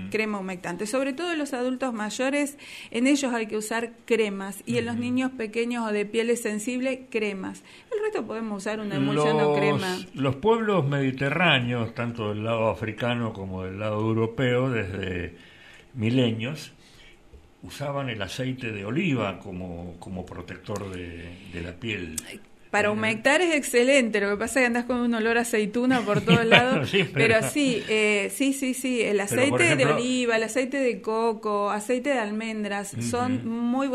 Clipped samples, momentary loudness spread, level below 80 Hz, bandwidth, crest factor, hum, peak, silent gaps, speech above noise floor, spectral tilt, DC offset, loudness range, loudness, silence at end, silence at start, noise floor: under 0.1%; 14 LU; -58 dBFS; 15 kHz; 26 dB; none; 0 dBFS; none; 26 dB; -5 dB/octave; under 0.1%; 9 LU; -25 LUFS; 0 s; 0 s; -51 dBFS